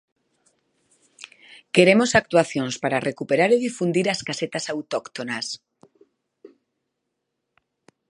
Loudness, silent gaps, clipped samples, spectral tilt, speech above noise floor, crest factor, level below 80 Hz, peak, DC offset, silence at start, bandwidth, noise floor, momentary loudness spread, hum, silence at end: -21 LUFS; none; under 0.1%; -4.5 dB/octave; 58 dB; 24 dB; -62 dBFS; 0 dBFS; under 0.1%; 1.75 s; 11.5 kHz; -79 dBFS; 18 LU; none; 1.6 s